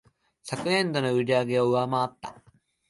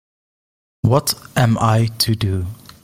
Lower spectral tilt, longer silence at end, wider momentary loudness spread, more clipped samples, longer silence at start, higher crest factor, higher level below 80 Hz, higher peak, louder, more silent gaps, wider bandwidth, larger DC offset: about the same, -5.5 dB/octave vs -5 dB/octave; first, 0.6 s vs 0.3 s; first, 18 LU vs 7 LU; neither; second, 0.45 s vs 0.85 s; about the same, 16 dB vs 16 dB; second, -68 dBFS vs -44 dBFS; second, -10 dBFS vs -2 dBFS; second, -26 LUFS vs -18 LUFS; neither; second, 11.5 kHz vs 16.5 kHz; neither